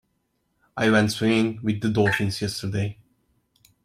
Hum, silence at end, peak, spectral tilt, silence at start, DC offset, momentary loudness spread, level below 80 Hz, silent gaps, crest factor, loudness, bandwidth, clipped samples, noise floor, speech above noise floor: none; 0.9 s; -6 dBFS; -5.5 dB/octave; 0.75 s; under 0.1%; 9 LU; -56 dBFS; none; 18 dB; -23 LUFS; 15.5 kHz; under 0.1%; -72 dBFS; 50 dB